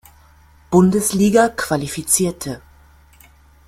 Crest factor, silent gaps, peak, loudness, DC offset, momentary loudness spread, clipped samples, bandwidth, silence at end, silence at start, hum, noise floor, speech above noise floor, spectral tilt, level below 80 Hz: 20 dB; none; 0 dBFS; -16 LUFS; under 0.1%; 14 LU; under 0.1%; 16 kHz; 1.1 s; 0.7 s; none; -49 dBFS; 33 dB; -5 dB/octave; -46 dBFS